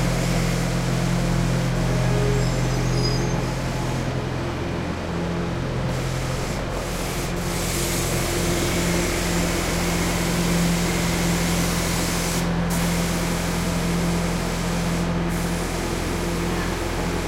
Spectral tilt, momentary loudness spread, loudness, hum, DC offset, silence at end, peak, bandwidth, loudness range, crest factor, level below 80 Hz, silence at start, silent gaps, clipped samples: -5 dB/octave; 5 LU; -23 LUFS; none; under 0.1%; 0 s; -8 dBFS; 16 kHz; 4 LU; 14 dB; -32 dBFS; 0 s; none; under 0.1%